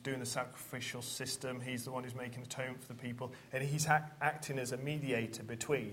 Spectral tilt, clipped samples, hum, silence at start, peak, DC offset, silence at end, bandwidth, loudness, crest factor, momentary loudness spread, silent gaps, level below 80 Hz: -4 dB/octave; under 0.1%; none; 0 s; -14 dBFS; under 0.1%; 0 s; 16 kHz; -39 LUFS; 24 dB; 11 LU; none; -72 dBFS